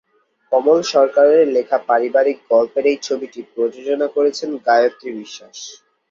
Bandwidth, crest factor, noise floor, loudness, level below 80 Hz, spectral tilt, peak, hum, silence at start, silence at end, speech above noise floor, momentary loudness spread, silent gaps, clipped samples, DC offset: 7.6 kHz; 16 dB; -39 dBFS; -16 LUFS; -68 dBFS; -3.5 dB/octave; -2 dBFS; none; 0.5 s; 0.35 s; 22 dB; 18 LU; none; under 0.1%; under 0.1%